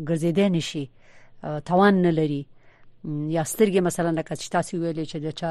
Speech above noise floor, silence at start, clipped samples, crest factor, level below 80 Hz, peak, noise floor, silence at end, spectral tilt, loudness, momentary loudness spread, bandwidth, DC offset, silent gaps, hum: 26 dB; 0 s; under 0.1%; 16 dB; -56 dBFS; -8 dBFS; -49 dBFS; 0 s; -6 dB/octave; -24 LUFS; 14 LU; 13 kHz; under 0.1%; none; none